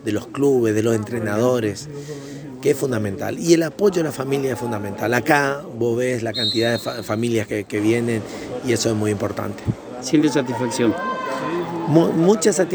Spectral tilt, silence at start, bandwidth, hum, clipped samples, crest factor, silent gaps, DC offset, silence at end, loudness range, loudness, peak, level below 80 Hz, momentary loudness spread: -5 dB/octave; 0 s; over 20 kHz; none; under 0.1%; 20 dB; none; under 0.1%; 0 s; 2 LU; -20 LUFS; 0 dBFS; -54 dBFS; 9 LU